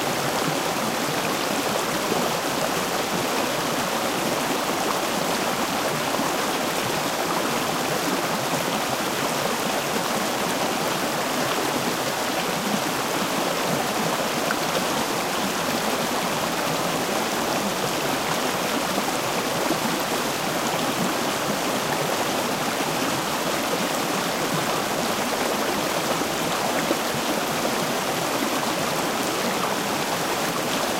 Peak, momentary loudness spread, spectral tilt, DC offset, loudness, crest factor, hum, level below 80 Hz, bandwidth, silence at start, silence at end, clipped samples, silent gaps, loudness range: -8 dBFS; 1 LU; -3 dB/octave; under 0.1%; -23 LUFS; 16 dB; none; -56 dBFS; 16 kHz; 0 s; 0 s; under 0.1%; none; 0 LU